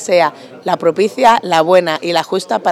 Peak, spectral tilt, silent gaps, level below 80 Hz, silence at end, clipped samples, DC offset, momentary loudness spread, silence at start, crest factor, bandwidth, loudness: 0 dBFS; -4 dB/octave; none; -58 dBFS; 0 s; under 0.1%; under 0.1%; 7 LU; 0 s; 14 dB; 15 kHz; -13 LUFS